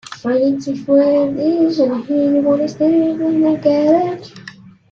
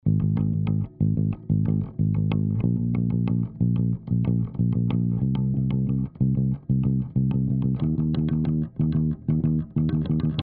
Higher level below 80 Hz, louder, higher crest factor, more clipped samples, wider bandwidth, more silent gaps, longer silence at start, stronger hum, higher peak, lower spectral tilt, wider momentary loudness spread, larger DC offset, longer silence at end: second, -58 dBFS vs -40 dBFS; first, -15 LUFS vs -24 LUFS; about the same, 14 dB vs 12 dB; neither; first, 7.4 kHz vs 4.3 kHz; neither; about the same, 0.1 s vs 0.05 s; neither; first, -2 dBFS vs -10 dBFS; second, -7 dB/octave vs -10.5 dB/octave; first, 8 LU vs 2 LU; neither; first, 0.4 s vs 0 s